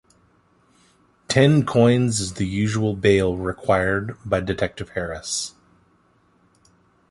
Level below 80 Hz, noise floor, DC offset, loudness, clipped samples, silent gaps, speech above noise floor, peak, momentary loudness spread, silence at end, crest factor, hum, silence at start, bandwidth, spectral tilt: -44 dBFS; -60 dBFS; under 0.1%; -21 LUFS; under 0.1%; none; 40 dB; -2 dBFS; 10 LU; 1.6 s; 20 dB; none; 1.3 s; 11.5 kHz; -5.5 dB/octave